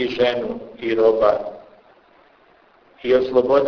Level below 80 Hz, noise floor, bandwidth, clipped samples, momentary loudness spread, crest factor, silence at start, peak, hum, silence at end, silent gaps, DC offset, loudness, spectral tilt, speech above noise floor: -54 dBFS; -54 dBFS; 5.4 kHz; under 0.1%; 14 LU; 18 dB; 0 s; -2 dBFS; none; 0 s; none; under 0.1%; -19 LUFS; -6.5 dB/octave; 36 dB